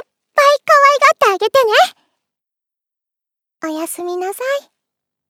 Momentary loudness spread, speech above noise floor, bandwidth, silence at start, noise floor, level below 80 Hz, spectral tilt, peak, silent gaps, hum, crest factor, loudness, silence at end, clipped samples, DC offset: 14 LU; 68 dB; 18 kHz; 0.35 s; -84 dBFS; -76 dBFS; -1 dB/octave; 0 dBFS; none; none; 16 dB; -13 LUFS; 0.7 s; under 0.1%; under 0.1%